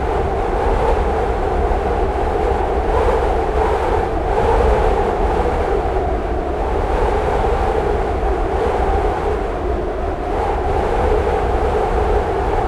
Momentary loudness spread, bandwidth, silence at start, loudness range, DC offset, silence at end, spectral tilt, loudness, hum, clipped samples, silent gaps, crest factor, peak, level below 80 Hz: 4 LU; 11 kHz; 0 s; 2 LU; under 0.1%; 0 s; -7.5 dB/octave; -18 LUFS; none; under 0.1%; none; 14 dB; -4 dBFS; -22 dBFS